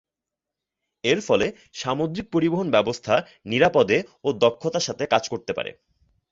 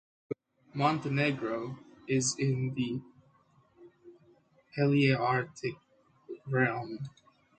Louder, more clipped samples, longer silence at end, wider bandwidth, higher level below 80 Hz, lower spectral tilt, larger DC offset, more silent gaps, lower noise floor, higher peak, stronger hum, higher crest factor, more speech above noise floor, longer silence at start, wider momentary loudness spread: first, -23 LUFS vs -31 LUFS; neither; about the same, 0.6 s vs 0.5 s; second, 7.8 kHz vs 9.4 kHz; first, -58 dBFS vs -70 dBFS; about the same, -4.5 dB/octave vs -5.5 dB/octave; neither; neither; first, -87 dBFS vs -66 dBFS; first, -2 dBFS vs -12 dBFS; neither; about the same, 20 dB vs 20 dB; first, 64 dB vs 36 dB; first, 1.05 s vs 0.3 s; second, 9 LU vs 17 LU